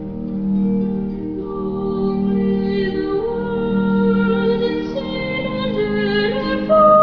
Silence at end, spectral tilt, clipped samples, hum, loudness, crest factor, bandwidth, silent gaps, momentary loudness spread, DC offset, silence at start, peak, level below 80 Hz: 0 s; -9 dB/octave; under 0.1%; none; -19 LUFS; 16 dB; 5.4 kHz; none; 8 LU; under 0.1%; 0 s; -2 dBFS; -40 dBFS